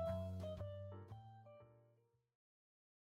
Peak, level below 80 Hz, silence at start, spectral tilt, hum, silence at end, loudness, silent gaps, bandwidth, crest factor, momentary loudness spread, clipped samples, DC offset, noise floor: -34 dBFS; -72 dBFS; 0 s; -8.5 dB/octave; none; 1.25 s; -50 LUFS; none; 13.5 kHz; 18 dB; 18 LU; under 0.1%; under 0.1%; -77 dBFS